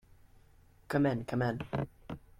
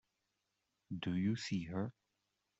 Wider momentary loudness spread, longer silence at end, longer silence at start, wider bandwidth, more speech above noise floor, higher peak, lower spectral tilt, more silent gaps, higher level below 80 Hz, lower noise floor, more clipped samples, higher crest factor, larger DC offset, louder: about the same, 10 LU vs 9 LU; second, 0.2 s vs 0.7 s; about the same, 0.9 s vs 0.9 s; first, 15 kHz vs 8 kHz; second, 29 dB vs 48 dB; first, -16 dBFS vs -26 dBFS; first, -8 dB/octave vs -6 dB/octave; neither; first, -58 dBFS vs -72 dBFS; second, -61 dBFS vs -86 dBFS; neither; about the same, 18 dB vs 16 dB; neither; first, -34 LUFS vs -40 LUFS